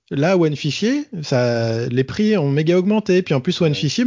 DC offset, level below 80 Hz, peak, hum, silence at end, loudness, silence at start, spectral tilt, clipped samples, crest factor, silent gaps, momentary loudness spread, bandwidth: under 0.1%; -54 dBFS; -4 dBFS; none; 0 s; -18 LUFS; 0.1 s; -6.5 dB/octave; under 0.1%; 14 dB; none; 4 LU; 7.6 kHz